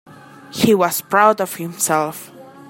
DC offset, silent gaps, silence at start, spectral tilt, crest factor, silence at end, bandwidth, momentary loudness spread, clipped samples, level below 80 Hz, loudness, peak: under 0.1%; none; 0.5 s; -4 dB/octave; 18 dB; 0 s; 16.5 kHz; 12 LU; under 0.1%; -58 dBFS; -17 LUFS; 0 dBFS